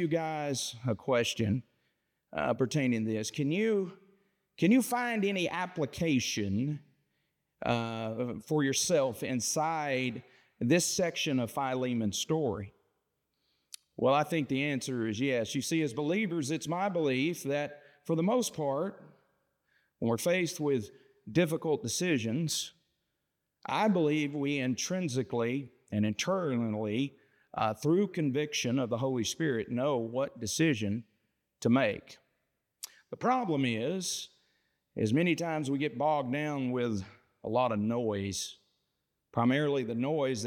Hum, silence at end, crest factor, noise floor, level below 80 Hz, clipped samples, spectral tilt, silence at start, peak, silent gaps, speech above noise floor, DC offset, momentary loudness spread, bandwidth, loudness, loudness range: none; 0 s; 18 dB; -83 dBFS; -72 dBFS; under 0.1%; -5 dB/octave; 0 s; -14 dBFS; none; 53 dB; under 0.1%; 9 LU; 18.5 kHz; -31 LUFS; 2 LU